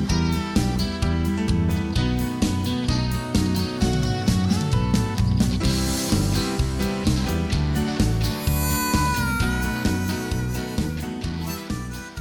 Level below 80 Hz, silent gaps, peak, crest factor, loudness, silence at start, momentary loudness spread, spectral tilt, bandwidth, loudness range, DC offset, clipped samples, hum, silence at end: -30 dBFS; none; -10 dBFS; 12 dB; -23 LUFS; 0 s; 6 LU; -5.5 dB/octave; 18 kHz; 2 LU; under 0.1%; under 0.1%; none; 0 s